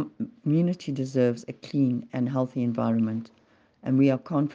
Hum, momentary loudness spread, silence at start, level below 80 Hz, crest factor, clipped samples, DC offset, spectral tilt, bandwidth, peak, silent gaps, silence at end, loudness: none; 10 LU; 0 s; -70 dBFS; 16 dB; under 0.1%; under 0.1%; -8.5 dB/octave; 7.6 kHz; -10 dBFS; none; 0 s; -26 LUFS